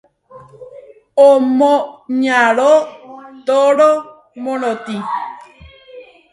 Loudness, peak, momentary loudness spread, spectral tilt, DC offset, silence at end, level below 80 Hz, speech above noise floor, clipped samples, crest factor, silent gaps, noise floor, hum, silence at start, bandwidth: -14 LUFS; 0 dBFS; 14 LU; -4.5 dB/octave; under 0.1%; 0.3 s; -58 dBFS; 29 dB; under 0.1%; 16 dB; none; -42 dBFS; none; 0.35 s; 11.5 kHz